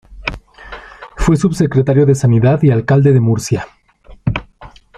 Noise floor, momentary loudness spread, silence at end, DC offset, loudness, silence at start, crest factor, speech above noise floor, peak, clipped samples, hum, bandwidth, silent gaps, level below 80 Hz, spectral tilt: -39 dBFS; 22 LU; 0.3 s; under 0.1%; -14 LUFS; 0.1 s; 12 dB; 28 dB; -2 dBFS; under 0.1%; none; 12 kHz; none; -32 dBFS; -7.5 dB/octave